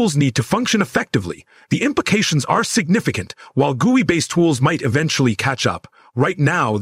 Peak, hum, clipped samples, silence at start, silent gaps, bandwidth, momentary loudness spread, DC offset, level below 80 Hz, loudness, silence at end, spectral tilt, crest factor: -4 dBFS; none; under 0.1%; 0 s; none; 16 kHz; 8 LU; under 0.1%; -54 dBFS; -18 LUFS; 0 s; -5 dB/octave; 14 dB